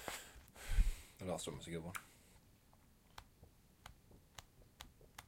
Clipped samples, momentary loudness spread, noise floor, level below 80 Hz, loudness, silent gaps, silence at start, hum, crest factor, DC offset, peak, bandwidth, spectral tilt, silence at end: under 0.1%; 25 LU; -68 dBFS; -46 dBFS; -47 LUFS; none; 0 s; none; 24 dB; under 0.1%; -20 dBFS; 16.5 kHz; -4 dB/octave; 0.05 s